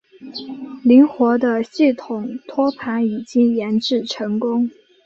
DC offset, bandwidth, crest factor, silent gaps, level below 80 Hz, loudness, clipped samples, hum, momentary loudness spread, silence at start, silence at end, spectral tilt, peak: under 0.1%; 7.6 kHz; 16 dB; none; -66 dBFS; -18 LUFS; under 0.1%; none; 16 LU; 0.2 s; 0.35 s; -6 dB/octave; -2 dBFS